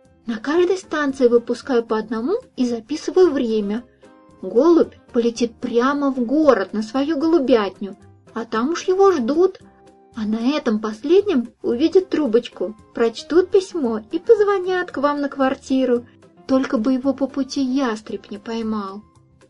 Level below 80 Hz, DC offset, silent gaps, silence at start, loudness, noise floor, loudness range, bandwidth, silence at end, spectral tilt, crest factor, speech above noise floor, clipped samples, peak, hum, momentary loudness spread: -56 dBFS; under 0.1%; none; 0.25 s; -20 LUFS; -49 dBFS; 2 LU; 10.5 kHz; 0.5 s; -5.5 dB/octave; 18 dB; 30 dB; under 0.1%; 0 dBFS; none; 12 LU